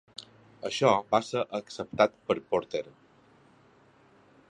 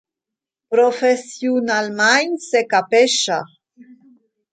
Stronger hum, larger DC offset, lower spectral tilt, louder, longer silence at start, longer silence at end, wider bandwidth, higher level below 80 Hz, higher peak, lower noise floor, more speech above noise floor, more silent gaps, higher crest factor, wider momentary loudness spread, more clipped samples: neither; neither; first, -4.5 dB/octave vs -2 dB/octave; second, -29 LUFS vs -17 LUFS; second, 0.2 s vs 0.7 s; first, 1.6 s vs 0.7 s; first, 11 kHz vs 9.4 kHz; first, -68 dBFS vs -74 dBFS; second, -8 dBFS vs -2 dBFS; second, -60 dBFS vs -86 dBFS; second, 32 dB vs 69 dB; neither; first, 24 dB vs 16 dB; first, 17 LU vs 7 LU; neither